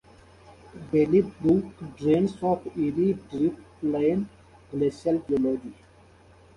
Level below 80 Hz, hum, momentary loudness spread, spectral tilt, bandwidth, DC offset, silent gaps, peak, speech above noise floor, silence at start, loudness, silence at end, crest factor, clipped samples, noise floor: -56 dBFS; none; 11 LU; -9 dB/octave; 11 kHz; under 0.1%; none; -10 dBFS; 29 dB; 0.5 s; -26 LUFS; 0.85 s; 16 dB; under 0.1%; -54 dBFS